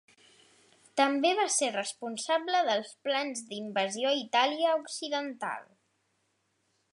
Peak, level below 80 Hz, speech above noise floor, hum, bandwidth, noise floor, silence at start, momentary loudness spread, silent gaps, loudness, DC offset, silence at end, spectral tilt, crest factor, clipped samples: -10 dBFS; -88 dBFS; 46 dB; none; 11.5 kHz; -76 dBFS; 0.95 s; 11 LU; none; -30 LUFS; under 0.1%; 1.3 s; -1.5 dB/octave; 20 dB; under 0.1%